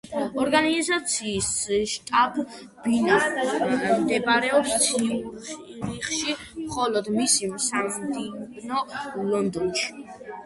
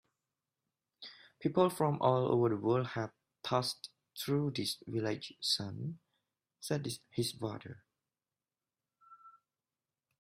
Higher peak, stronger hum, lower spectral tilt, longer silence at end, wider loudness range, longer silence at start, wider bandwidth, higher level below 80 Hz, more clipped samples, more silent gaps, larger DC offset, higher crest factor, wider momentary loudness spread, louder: first, -6 dBFS vs -14 dBFS; neither; second, -2.5 dB/octave vs -5.5 dB/octave; second, 0 s vs 0.9 s; second, 3 LU vs 9 LU; second, 0.05 s vs 1 s; second, 12 kHz vs 15.5 kHz; first, -56 dBFS vs -74 dBFS; neither; neither; neither; about the same, 18 dB vs 22 dB; second, 12 LU vs 18 LU; first, -24 LUFS vs -35 LUFS